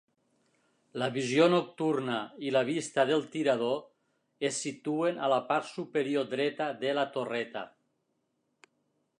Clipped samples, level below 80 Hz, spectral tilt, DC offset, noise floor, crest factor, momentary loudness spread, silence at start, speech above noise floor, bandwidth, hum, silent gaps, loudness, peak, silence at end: under 0.1%; -84 dBFS; -4.5 dB/octave; under 0.1%; -78 dBFS; 20 dB; 9 LU; 0.95 s; 49 dB; 11 kHz; none; none; -30 LUFS; -10 dBFS; 1.5 s